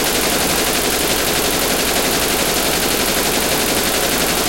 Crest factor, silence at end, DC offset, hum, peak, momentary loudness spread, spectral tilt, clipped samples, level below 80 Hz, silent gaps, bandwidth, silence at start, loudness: 16 dB; 0 s; under 0.1%; none; -2 dBFS; 0 LU; -2 dB/octave; under 0.1%; -34 dBFS; none; 17.5 kHz; 0 s; -15 LUFS